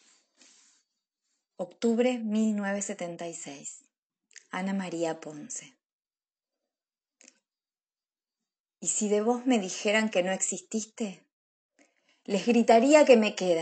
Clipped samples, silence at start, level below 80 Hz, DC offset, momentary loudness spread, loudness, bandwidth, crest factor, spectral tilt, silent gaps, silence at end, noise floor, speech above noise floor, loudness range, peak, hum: under 0.1%; 1.6 s; -84 dBFS; under 0.1%; 19 LU; -26 LUFS; 9.2 kHz; 24 dB; -4 dB/octave; 3.98-4.10 s, 5.86-6.00 s, 8.60-8.64 s, 11.33-11.69 s; 0 s; under -90 dBFS; over 64 dB; 12 LU; -6 dBFS; none